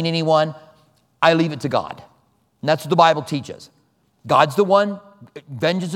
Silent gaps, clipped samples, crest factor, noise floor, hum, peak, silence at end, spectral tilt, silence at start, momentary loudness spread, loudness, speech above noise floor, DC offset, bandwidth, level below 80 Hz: none; under 0.1%; 20 dB; -61 dBFS; none; 0 dBFS; 0 s; -5.5 dB/octave; 0 s; 20 LU; -18 LUFS; 43 dB; under 0.1%; 15.5 kHz; -66 dBFS